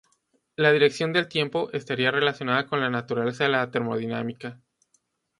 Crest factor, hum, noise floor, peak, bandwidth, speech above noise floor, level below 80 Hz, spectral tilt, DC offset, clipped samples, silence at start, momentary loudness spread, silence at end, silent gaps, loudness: 22 dB; none; -70 dBFS; -4 dBFS; 11.5 kHz; 46 dB; -70 dBFS; -5.5 dB/octave; under 0.1%; under 0.1%; 0.6 s; 10 LU; 0.85 s; none; -24 LUFS